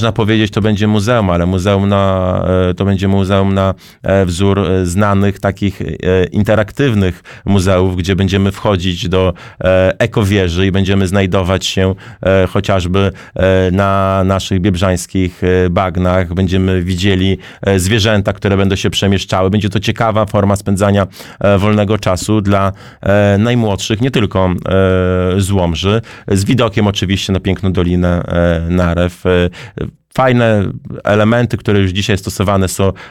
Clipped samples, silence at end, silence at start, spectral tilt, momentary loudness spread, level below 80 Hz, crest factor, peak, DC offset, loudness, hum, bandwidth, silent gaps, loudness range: under 0.1%; 0 s; 0 s; -6 dB/octave; 4 LU; -34 dBFS; 10 dB; -2 dBFS; 0.3%; -13 LUFS; none; 14.5 kHz; none; 1 LU